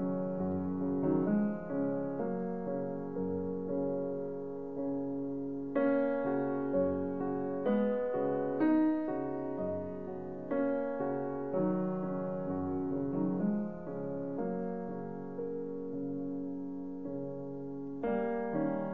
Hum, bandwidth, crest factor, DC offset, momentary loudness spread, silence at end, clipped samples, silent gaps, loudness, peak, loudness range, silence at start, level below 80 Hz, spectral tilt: none; 4.1 kHz; 16 dB; 0.3%; 9 LU; 0 s; under 0.1%; none; -35 LUFS; -20 dBFS; 6 LU; 0 s; -64 dBFS; -9.5 dB/octave